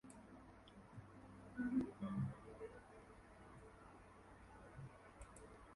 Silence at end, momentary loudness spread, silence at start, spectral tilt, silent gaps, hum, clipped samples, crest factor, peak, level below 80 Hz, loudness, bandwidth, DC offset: 0 s; 19 LU; 0.05 s; -7.5 dB/octave; none; none; under 0.1%; 22 dB; -30 dBFS; -68 dBFS; -50 LUFS; 11.5 kHz; under 0.1%